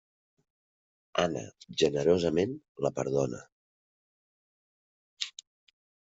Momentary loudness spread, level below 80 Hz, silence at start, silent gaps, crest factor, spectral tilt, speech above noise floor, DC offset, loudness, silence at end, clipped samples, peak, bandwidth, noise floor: 12 LU; -66 dBFS; 1.15 s; 2.69-2.75 s, 3.52-5.17 s; 22 dB; -4.5 dB/octave; over 61 dB; under 0.1%; -30 LUFS; 0.8 s; under 0.1%; -10 dBFS; 8 kHz; under -90 dBFS